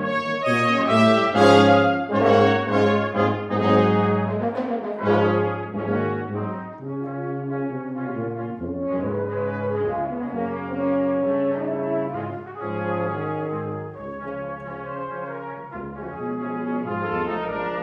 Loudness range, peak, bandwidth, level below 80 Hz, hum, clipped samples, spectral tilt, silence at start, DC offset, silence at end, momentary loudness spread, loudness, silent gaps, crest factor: 11 LU; -2 dBFS; 11 kHz; -58 dBFS; none; under 0.1%; -7 dB/octave; 0 s; under 0.1%; 0 s; 15 LU; -23 LUFS; none; 20 dB